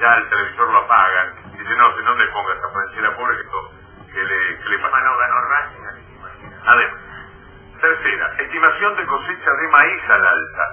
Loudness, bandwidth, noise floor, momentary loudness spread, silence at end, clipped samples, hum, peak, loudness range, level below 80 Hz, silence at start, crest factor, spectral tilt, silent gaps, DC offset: -16 LUFS; 3.5 kHz; -41 dBFS; 16 LU; 0 s; under 0.1%; none; 0 dBFS; 4 LU; -50 dBFS; 0 s; 18 dB; -6 dB/octave; none; under 0.1%